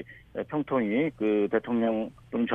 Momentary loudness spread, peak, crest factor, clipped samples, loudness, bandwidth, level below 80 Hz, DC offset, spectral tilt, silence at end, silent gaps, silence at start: 8 LU; -12 dBFS; 16 dB; under 0.1%; -28 LUFS; 3.8 kHz; -62 dBFS; under 0.1%; -8.5 dB/octave; 0 s; none; 0 s